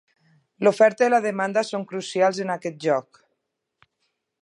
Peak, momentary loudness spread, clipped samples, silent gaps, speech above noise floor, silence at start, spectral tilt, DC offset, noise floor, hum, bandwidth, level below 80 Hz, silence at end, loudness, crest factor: -6 dBFS; 11 LU; under 0.1%; none; 57 dB; 0.6 s; -5 dB/octave; under 0.1%; -78 dBFS; none; 11.5 kHz; -78 dBFS; 1.4 s; -22 LUFS; 18 dB